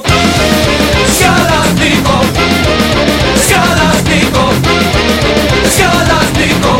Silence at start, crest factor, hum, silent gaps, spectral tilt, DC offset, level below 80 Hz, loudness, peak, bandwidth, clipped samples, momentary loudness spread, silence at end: 0 s; 8 dB; none; none; -4 dB/octave; under 0.1%; -22 dBFS; -8 LUFS; 0 dBFS; 17 kHz; 0.1%; 2 LU; 0 s